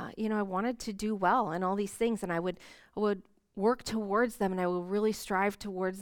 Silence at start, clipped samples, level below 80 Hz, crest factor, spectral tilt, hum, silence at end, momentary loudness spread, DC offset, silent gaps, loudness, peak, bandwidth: 0 s; under 0.1%; -60 dBFS; 18 dB; -5.5 dB/octave; none; 0 s; 7 LU; under 0.1%; none; -32 LUFS; -14 dBFS; 19 kHz